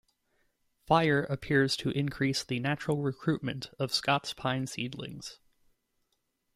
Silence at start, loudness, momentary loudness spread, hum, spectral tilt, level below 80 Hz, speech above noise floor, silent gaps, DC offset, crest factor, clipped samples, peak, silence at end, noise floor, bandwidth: 0.9 s; -30 LUFS; 11 LU; none; -5 dB/octave; -60 dBFS; 48 dB; none; under 0.1%; 22 dB; under 0.1%; -10 dBFS; 1.2 s; -78 dBFS; 14.5 kHz